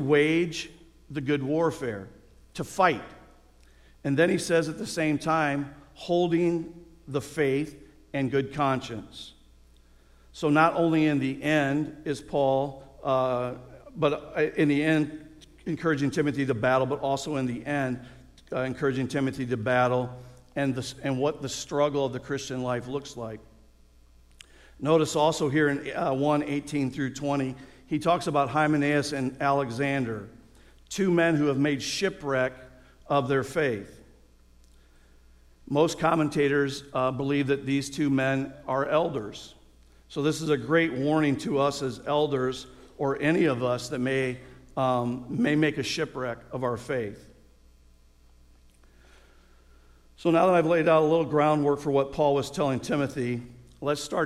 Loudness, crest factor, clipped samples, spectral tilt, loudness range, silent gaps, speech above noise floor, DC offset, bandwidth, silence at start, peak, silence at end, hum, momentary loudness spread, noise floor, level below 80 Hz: -27 LUFS; 18 dB; under 0.1%; -6 dB/octave; 5 LU; none; 31 dB; under 0.1%; 13.5 kHz; 0 s; -8 dBFS; 0 s; none; 12 LU; -57 dBFS; -56 dBFS